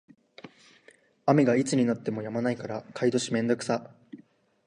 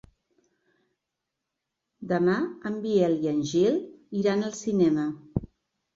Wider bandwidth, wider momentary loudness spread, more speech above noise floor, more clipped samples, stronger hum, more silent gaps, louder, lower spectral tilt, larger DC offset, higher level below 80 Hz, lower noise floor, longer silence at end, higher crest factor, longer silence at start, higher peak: first, 11 kHz vs 7.8 kHz; about the same, 10 LU vs 11 LU; second, 33 dB vs 60 dB; neither; neither; neither; about the same, -27 LUFS vs -26 LUFS; about the same, -6 dB/octave vs -6.5 dB/octave; neither; second, -72 dBFS vs -56 dBFS; second, -60 dBFS vs -84 dBFS; about the same, 0.5 s vs 0.5 s; about the same, 20 dB vs 18 dB; second, 0.45 s vs 2 s; about the same, -8 dBFS vs -10 dBFS